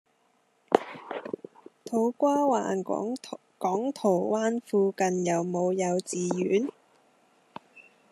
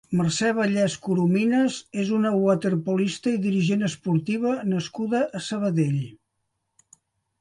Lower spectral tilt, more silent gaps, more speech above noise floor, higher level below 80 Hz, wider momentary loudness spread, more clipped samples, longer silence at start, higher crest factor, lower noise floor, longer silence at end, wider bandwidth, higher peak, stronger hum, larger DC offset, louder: about the same, -5.5 dB/octave vs -6 dB/octave; neither; second, 42 dB vs 54 dB; second, -78 dBFS vs -64 dBFS; first, 15 LU vs 6 LU; neither; first, 0.7 s vs 0.1 s; first, 28 dB vs 16 dB; second, -69 dBFS vs -77 dBFS; second, 0.3 s vs 1.25 s; first, 13 kHz vs 11.5 kHz; first, -2 dBFS vs -8 dBFS; neither; neither; second, -28 LUFS vs -24 LUFS